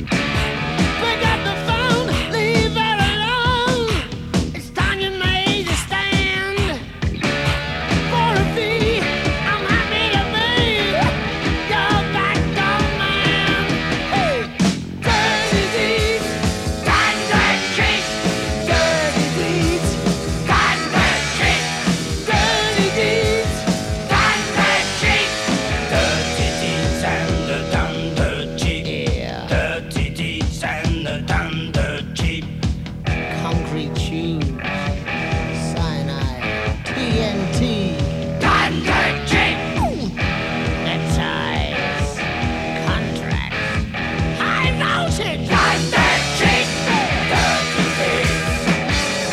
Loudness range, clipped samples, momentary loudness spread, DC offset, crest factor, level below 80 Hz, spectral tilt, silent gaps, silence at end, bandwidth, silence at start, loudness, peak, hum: 5 LU; under 0.1%; 7 LU; under 0.1%; 16 dB; -30 dBFS; -4.5 dB/octave; none; 0 s; 15 kHz; 0 s; -18 LUFS; -4 dBFS; none